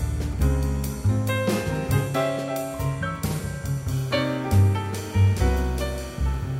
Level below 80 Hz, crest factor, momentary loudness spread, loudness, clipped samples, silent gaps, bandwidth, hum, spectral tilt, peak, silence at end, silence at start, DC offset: -30 dBFS; 14 dB; 8 LU; -25 LUFS; under 0.1%; none; 16 kHz; none; -6 dB/octave; -8 dBFS; 0 s; 0 s; under 0.1%